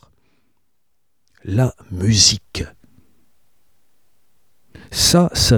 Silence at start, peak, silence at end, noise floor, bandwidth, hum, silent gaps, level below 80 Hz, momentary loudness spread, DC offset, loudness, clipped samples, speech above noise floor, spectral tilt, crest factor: 1.45 s; 0 dBFS; 0 s; -74 dBFS; 18.5 kHz; none; none; -38 dBFS; 17 LU; 0.3%; -16 LUFS; under 0.1%; 58 dB; -3.5 dB/octave; 20 dB